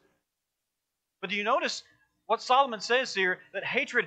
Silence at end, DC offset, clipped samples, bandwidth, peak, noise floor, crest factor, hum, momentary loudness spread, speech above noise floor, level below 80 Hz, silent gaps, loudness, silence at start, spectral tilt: 0 s; under 0.1%; under 0.1%; 9.2 kHz; -10 dBFS; -85 dBFS; 20 dB; none; 8 LU; 57 dB; -86 dBFS; none; -28 LUFS; 1.2 s; -2.5 dB/octave